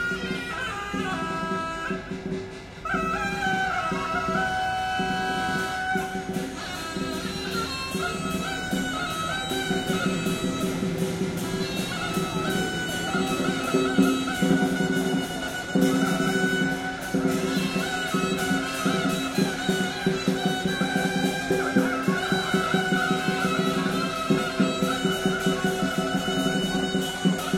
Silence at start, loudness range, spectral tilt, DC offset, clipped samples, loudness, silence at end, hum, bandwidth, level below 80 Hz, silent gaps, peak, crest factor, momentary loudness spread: 0 s; 4 LU; -4.5 dB/octave; under 0.1%; under 0.1%; -26 LUFS; 0 s; none; 16.5 kHz; -50 dBFS; none; -8 dBFS; 18 dB; 6 LU